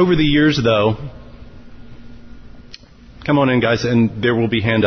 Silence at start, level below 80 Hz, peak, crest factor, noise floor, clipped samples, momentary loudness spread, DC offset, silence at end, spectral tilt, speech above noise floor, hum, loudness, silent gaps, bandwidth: 0 s; -38 dBFS; -4 dBFS; 14 dB; -41 dBFS; under 0.1%; 9 LU; under 0.1%; 0 s; -7 dB/octave; 26 dB; none; -16 LUFS; none; 6.6 kHz